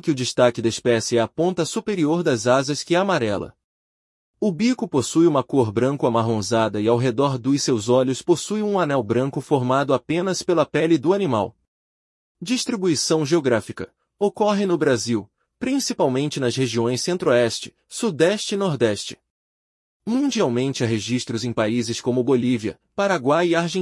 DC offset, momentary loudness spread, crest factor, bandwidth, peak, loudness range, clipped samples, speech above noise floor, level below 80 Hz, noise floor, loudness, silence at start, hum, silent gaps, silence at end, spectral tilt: under 0.1%; 7 LU; 16 dB; 12 kHz; -4 dBFS; 3 LU; under 0.1%; over 70 dB; -62 dBFS; under -90 dBFS; -21 LUFS; 0.05 s; none; 3.64-4.34 s, 11.68-12.35 s, 19.30-20.00 s; 0 s; -5 dB/octave